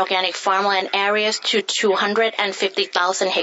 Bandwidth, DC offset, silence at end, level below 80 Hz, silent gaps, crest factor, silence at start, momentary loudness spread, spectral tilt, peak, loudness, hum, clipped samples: 8 kHz; under 0.1%; 0 s; -80 dBFS; none; 16 dB; 0 s; 2 LU; -1.5 dB/octave; -2 dBFS; -19 LUFS; none; under 0.1%